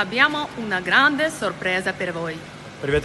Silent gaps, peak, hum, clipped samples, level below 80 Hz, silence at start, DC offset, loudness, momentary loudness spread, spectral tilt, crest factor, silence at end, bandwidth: none; -2 dBFS; none; under 0.1%; -46 dBFS; 0 s; under 0.1%; -21 LUFS; 14 LU; -4 dB/octave; 20 dB; 0 s; 12.5 kHz